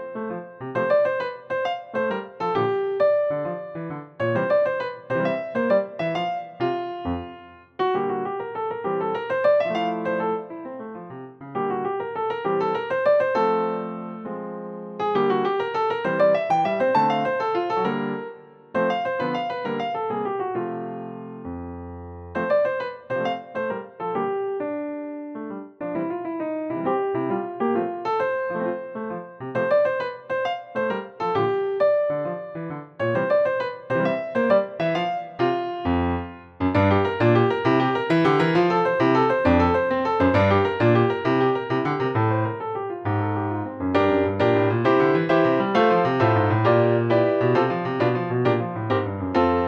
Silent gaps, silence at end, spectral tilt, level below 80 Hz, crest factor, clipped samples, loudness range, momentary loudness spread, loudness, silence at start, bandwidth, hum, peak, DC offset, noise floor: none; 0 s; -8 dB/octave; -54 dBFS; 16 dB; under 0.1%; 8 LU; 13 LU; -23 LUFS; 0 s; 7.6 kHz; none; -6 dBFS; under 0.1%; -44 dBFS